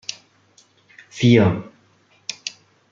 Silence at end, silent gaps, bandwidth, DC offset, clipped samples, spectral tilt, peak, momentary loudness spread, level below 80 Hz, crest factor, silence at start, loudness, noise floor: 0.4 s; none; 7.6 kHz; under 0.1%; under 0.1%; -6 dB/octave; -2 dBFS; 19 LU; -58 dBFS; 20 dB; 1.15 s; -18 LUFS; -58 dBFS